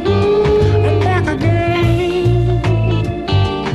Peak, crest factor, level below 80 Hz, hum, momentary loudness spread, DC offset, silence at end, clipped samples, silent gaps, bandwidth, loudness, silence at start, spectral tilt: -4 dBFS; 10 dB; -26 dBFS; none; 3 LU; under 0.1%; 0 s; under 0.1%; none; 10.5 kHz; -14 LUFS; 0 s; -7.5 dB/octave